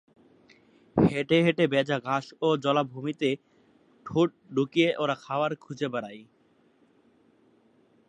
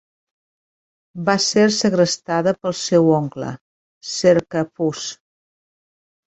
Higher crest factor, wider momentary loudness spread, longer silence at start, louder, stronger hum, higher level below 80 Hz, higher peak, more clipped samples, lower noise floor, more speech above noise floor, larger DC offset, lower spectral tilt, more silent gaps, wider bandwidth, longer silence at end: about the same, 20 dB vs 18 dB; second, 10 LU vs 15 LU; second, 0.95 s vs 1.15 s; second, -27 LUFS vs -18 LUFS; neither; about the same, -62 dBFS vs -60 dBFS; second, -8 dBFS vs -2 dBFS; neither; second, -64 dBFS vs under -90 dBFS; second, 37 dB vs over 72 dB; neither; first, -6.5 dB/octave vs -4.5 dB/octave; second, none vs 3.61-4.01 s; first, 9.8 kHz vs 8.4 kHz; first, 1.85 s vs 1.2 s